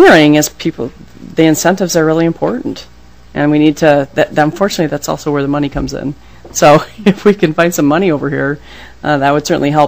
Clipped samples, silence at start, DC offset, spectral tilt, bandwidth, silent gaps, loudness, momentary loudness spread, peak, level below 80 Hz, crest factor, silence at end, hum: 2%; 0 s; 1%; -5 dB/octave; 16 kHz; none; -12 LUFS; 13 LU; 0 dBFS; -38 dBFS; 12 dB; 0 s; none